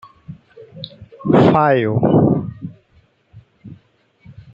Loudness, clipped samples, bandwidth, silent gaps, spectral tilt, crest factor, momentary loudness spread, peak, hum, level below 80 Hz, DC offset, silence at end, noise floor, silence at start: -15 LUFS; under 0.1%; 7.6 kHz; none; -9.5 dB/octave; 18 dB; 22 LU; -2 dBFS; none; -52 dBFS; under 0.1%; 0.8 s; -56 dBFS; 0.3 s